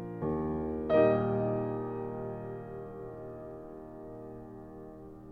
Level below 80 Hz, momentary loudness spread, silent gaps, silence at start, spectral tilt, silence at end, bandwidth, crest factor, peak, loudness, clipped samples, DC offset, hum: -54 dBFS; 21 LU; none; 0 s; -10 dB/octave; 0 s; 4.8 kHz; 20 dB; -14 dBFS; -33 LUFS; under 0.1%; under 0.1%; none